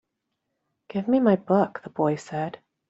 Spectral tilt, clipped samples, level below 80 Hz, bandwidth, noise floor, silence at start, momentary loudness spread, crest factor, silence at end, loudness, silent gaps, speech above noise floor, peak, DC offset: -8 dB/octave; under 0.1%; -68 dBFS; 8 kHz; -80 dBFS; 0.9 s; 11 LU; 20 dB; 0.35 s; -25 LUFS; none; 57 dB; -6 dBFS; under 0.1%